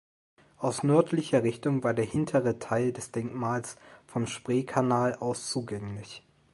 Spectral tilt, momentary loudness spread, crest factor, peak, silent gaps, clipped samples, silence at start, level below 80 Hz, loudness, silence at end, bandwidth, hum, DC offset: -6 dB/octave; 13 LU; 20 dB; -8 dBFS; none; under 0.1%; 0.6 s; -62 dBFS; -29 LUFS; 0.35 s; 11.5 kHz; none; under 0.1%